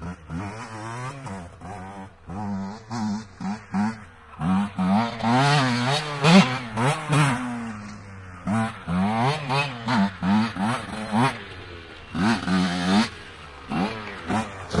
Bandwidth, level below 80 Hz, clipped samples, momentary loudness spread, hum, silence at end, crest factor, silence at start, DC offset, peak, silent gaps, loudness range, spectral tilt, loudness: 11.5 kHz; -52 dBFS; under 0.1%; 17 LU; none; 0 s; 24 dB; 0 s; under 0.1%; -2 dBFS; none; 11 LU; -5.5 dB/octave; -24 LUFS